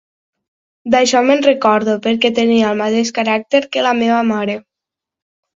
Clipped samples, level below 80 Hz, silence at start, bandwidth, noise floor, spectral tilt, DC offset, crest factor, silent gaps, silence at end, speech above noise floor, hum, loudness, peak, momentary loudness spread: under 0.1%; -58 dBFS; 0.85 s; 7.8 kHz; -84 dBFS; -4 dB/octave; under 0.1%; 16 dB; none; 0.95 s; 70 dB; none; -14 LUFS; 0 dBFS; 6 LU